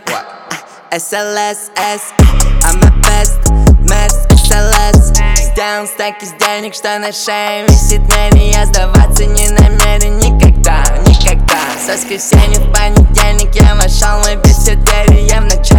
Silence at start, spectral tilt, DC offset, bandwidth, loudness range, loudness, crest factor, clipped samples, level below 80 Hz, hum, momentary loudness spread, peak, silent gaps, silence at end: 0.05 s; -4.5 dB/octave; under 0.1%; 19 kHz; 3 LU; -10 LUFS; 8 dB; 0.5%; -10 dBFS; none; 8 LU; 0 dBFS; none; 0 s